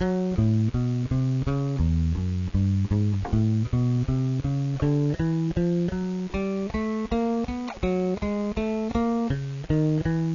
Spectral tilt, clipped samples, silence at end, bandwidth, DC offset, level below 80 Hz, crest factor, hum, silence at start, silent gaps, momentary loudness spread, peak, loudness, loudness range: -8.5 dB/octave; under 0.1%; 0 s; 7.4 kHz; under 0.1%; -36 dBFS; 12 dB; none; 0 s; none; 4 LU; -12 dBFS; -26 LUFS; 2 LU